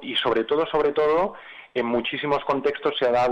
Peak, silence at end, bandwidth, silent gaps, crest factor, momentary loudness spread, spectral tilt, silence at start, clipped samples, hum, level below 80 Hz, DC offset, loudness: -12 dBFS; 0 s; 10 kHz; none; 12 dB; 7 LU; -5.5 dB/octave; 0 s; under 0.1%; none; -54 dBFS; under 0.1%; -23 LUFS